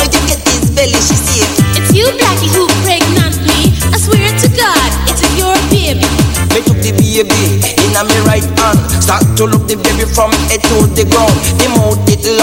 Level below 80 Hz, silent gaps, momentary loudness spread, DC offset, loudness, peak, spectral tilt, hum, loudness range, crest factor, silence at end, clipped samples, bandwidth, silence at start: -22 dBFS; none; 2 LU; under 0.1%; -9 LUFS; 0 dBFS; -4 dB/octave; none; 1 LU; 10 dB; 0 s; 0.4%; 17.5 kHz; 0 s